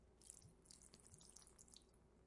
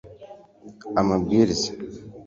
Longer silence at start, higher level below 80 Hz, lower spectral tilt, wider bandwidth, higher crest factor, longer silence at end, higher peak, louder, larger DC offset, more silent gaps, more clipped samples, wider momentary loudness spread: about the same, 0 s vs 0.05 s; second, -76 dBFS vs -50 dBFS; second, -2.5 dB/octave vs -5.5 dB/octave; first, 12 kHz vs 8 kHz; first, 32 dB vs 18 dB; about the same, 0 s vs 0 s; second, -34 dBFS vs -6 dBFS; second, -64 LUFS vs -22 LUFS; neither; neither; neither; second, 3 LU vs 21 LU